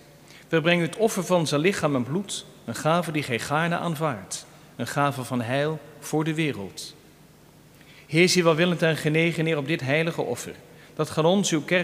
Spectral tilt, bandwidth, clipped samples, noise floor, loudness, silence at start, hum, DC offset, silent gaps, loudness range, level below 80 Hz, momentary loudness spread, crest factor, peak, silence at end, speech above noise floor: -5 dB/octave; 15.5 kHz; under 0.1%; -52 dBFS; -24 LUFS; 0.3 s; none; under 0.1%; none; 5 LU; -64 dBFS; 14 LU; 20 dB; -4 dBFS; 0 s; 28 dB